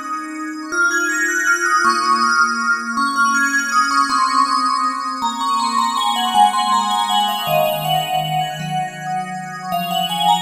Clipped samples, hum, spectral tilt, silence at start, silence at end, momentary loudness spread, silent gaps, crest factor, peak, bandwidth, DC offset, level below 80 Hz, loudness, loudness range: under 0.1%; none; -2.5 dB/octave; 0 s; 0 s; 9 LU; none; 16 dB; -2 dBFS; 16 kHz; under 0.1%; -64 dBFS; -17 LUFS; 4 LU